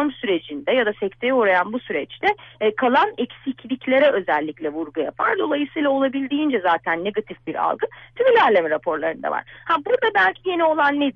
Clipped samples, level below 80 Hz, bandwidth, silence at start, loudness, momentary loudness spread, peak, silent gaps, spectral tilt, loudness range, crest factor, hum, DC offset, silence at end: under 0.1%; -62 dBFS; 6.4 kHz; 0 s; -21 LUFS; 10 LU; -6 dBFS; none; -6.5 dB/octave; 2 LU; 14 dB; none; under 0.1%; 0.05 s